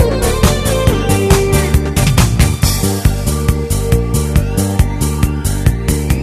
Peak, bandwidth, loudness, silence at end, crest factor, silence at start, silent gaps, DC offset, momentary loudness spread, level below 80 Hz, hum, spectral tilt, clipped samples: 0 dBFS; 14.5 kHz; -14 LUFS; 0 s; 12 dB; 0 s; none; under 0.1%; 4 LU; -18 dBFS; none; -5.5 dB/octave; under 0.1%